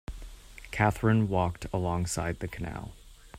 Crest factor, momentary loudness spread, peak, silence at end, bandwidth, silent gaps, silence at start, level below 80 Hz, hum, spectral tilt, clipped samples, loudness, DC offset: 20 dB; 21 LU; -10 dBFS; 0 s; 15.5 kHz; none; 0.1 s; -46 dBFS; none; -6 dB/octave; under 0.1%; -30 LUFS; under 0.1%